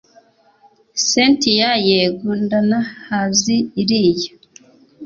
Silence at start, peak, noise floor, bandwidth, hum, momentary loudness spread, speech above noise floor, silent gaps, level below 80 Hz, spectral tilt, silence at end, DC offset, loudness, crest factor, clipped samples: 0.95 s; -2 dBFS; -53 dBFS; 7.6 kHz; none; 9 LU; 37 dB; none; -56 dBFS; -3.5 dB/octave; 0 s; under 0.1%; -16 LUFS; 16 dB; under 0.1%